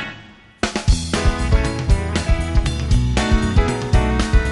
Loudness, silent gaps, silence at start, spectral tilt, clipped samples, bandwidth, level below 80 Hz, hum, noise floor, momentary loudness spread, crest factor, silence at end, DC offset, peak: -19 LUFS; none; 0 s; -5.5 dB/octave; under 0.1%; 11.5 kHz; -20 dBFS; none; -42 dBFS; 4 LU; 16 dB; 0 s; under 0.1%; -2 dBFS